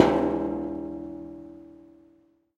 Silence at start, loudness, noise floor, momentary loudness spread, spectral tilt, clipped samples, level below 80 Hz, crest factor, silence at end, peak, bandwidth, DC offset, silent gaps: 0 s; -29 LUFS; -62 dBFS; 22 LU; -7 dB/octave; under 0.1%; -52 dBFS; 28 dB; 0.85 s; -2 dBFS; 8.6 kHz; under 0.1%; none